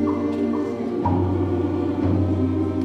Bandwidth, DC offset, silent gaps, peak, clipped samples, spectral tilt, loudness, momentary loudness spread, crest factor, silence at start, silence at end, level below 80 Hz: 6.4 kHz; under 0.1%; none; -8 dBFS; under 0.1%; -9.5 dB/octave; -22 LUFS; 3 LU; 12 dB; 0 s; 0 s; -46 dBFS